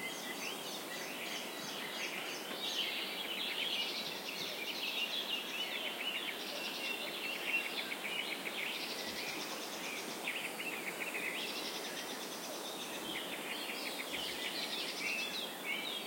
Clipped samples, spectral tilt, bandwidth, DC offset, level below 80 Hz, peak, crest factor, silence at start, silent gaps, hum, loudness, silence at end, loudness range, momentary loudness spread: under 0.1%; -1 dB/octave; 16.5 kHz; under 0.1%; -82 dBFS; -24 dBFS; 16 dB; 0 s; none; none; -38 LUFS; 0 s; 3 LU; 5 LU